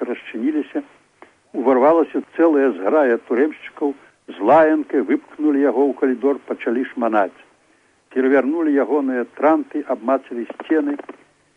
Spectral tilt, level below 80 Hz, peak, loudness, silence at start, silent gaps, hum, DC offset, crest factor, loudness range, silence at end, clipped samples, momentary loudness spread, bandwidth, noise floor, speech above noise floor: -7 dB/octave; -68 dBFS; -4 dBFS; -19 LUFS; 0 s; none; none; under 0.1%; 14 dB; 3 LU; 0.55 s; under 0.1%; 10 LU; 4 kHz; -58 dBFS; 40 dB